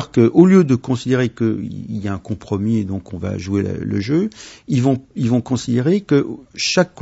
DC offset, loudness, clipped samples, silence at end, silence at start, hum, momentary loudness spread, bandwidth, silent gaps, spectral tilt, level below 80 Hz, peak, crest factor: under 0.1%; -18 LUFS; under 0.1%; 0 s; 0 s; none; 13 LU; 8 kHz; none; -6.5 dB/octave; -50 dBFS; 0 dBFS; 18 dB